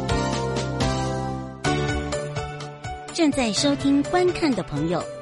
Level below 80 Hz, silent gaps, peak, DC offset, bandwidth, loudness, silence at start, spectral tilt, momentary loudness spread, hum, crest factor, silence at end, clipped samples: -38 dBFS; none; -8 dBFS; under 0.1%; 11.5 kHz; -24 LUFS; 0 s; -5 dB/octave; 10 LU; none; 16 dB; 0 s; under 0.1%